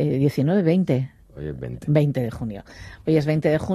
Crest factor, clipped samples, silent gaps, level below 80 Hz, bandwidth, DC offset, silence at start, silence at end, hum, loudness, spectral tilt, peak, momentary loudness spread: 18 dB; under 0.1%; none; -48 dBFS; 12.5 kHz; under 0.1%; 0 s; 0 s; none; -22 LUFS; -8.5 dB/octave; -4 dBFS; 14 LU